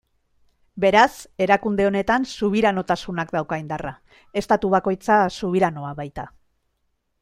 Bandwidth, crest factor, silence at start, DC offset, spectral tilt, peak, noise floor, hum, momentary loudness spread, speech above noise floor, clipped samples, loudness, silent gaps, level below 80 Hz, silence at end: 15 kHz; 20 dB; 0.75 s; under 0.1%; -5.5 dB/octave; -2 dBFS; -72 dBFS; none; 13 LU; 51 dB; under 0.1%; -21 LUFS; none; -50 dBFS; 0.95 s